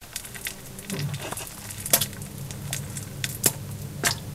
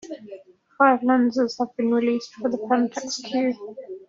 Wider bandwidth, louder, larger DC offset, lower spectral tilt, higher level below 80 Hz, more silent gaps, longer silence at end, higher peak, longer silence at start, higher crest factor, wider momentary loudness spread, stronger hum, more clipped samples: first, 16 kHz vs 7.6 kHz; second, -28 LUFS vs -22 LUFS; neither; about the same, -2.5 dB/octave vs -3 dB/octave; first, -50 dBFS vs -70 dBFS; neither; about the same, 0 s vs 0.05 s; first, 0 dBFS vs -4 dBFS; about the same, 0 s vs 0.05 s; first, 30 dB vs 20 dB; second, 14 LU vs 17 LU; neither; neither